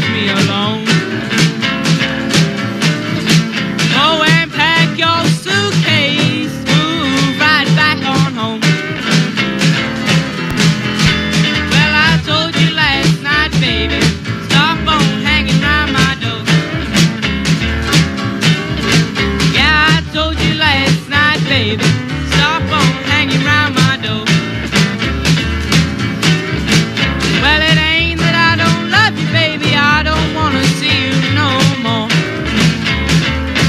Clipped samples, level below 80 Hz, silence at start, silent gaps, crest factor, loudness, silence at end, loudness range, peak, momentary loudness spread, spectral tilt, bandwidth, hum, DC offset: under 0.1%; -28 dBFS; 0 s; none; 12 dB; -12 LUFS; 0 s; 2 LU; 0 dBFS; 5 LU; -4.5 dB/octave; 14 kHz; none; under 0.1%